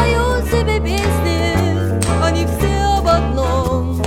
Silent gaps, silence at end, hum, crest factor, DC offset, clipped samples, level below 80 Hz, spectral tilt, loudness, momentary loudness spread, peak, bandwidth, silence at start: none; 0 s; none; 14 dB; under 0.1%; under 0.1%; -22 dBFS; -5.5 dB/octave; -16 LUFS; 2 LU; 0 dBFS; 16.5 kHz; 0 s